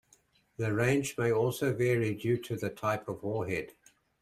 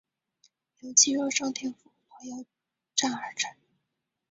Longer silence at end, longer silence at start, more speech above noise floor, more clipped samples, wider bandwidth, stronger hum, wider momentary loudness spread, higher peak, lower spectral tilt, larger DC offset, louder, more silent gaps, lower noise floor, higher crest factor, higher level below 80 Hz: second, 0.5 s vs 0.8 s; second, 0.6 s vs 0.85 s; second, 36 dB vs 55 dB; neither; first, 15 kHz vs 8 kHz; neither; second, 8 LU vs 22 LU; second, -14 dBFS vs -6 dBFS; first, -6 dB/octave vs 0 dB/octave; neither; second, -31 LUFS vs -26 LUFS; neither; second, -67 dBFS vs -83 dBFS; second, 18 dB vs 26 dB; first, -64 dBFS vs -78 dBFS